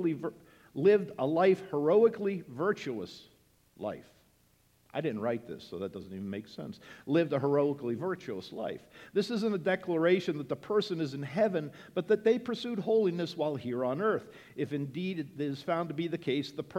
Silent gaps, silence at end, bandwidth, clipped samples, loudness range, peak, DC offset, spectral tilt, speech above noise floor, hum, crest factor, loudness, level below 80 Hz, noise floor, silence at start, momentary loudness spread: none; 0 s; 14 kHz; under 0.1%; 10 LU; -14 dBFS; under 0.1%; -7 dB/octave; 36 dB; none; 18 dB; -32 LUFS; -74 dBFS; -67 dBFS; 0 s; 14 LU